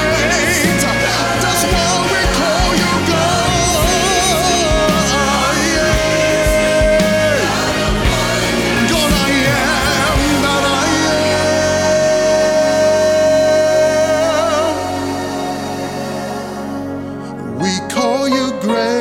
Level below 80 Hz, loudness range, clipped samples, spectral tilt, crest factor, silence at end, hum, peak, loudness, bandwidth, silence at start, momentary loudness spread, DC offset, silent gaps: -28 dBFS; 6 LU; under 0.1%; -3.5 dB/octave; 12 dB; 0 s; none; -2 dBFS; -14 LUFS; 18 kHz; 0 s; 9 LU; under 0.1%; none